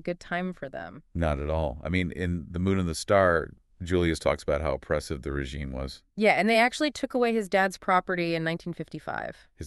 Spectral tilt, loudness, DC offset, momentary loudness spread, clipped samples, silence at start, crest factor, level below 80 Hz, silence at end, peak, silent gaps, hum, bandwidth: -5.5 dB/octave; -27 LUFS; under 0.1%; 15 LU; under 0.1%; 0.05 s; 20 dB; -42 dBFS; 0 s; -8 dBFS; none; none; 12 kHz